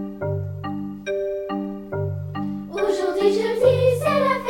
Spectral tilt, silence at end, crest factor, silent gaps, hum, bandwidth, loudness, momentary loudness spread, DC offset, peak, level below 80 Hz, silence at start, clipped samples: -6.5 dB/octave; 0 s; 18 dB; none; none; 16.5 kHz; -23 LUFS; 11 LU; under 0.1%; -4 dBFS; -52 dBFS; 0 s; under 0.1%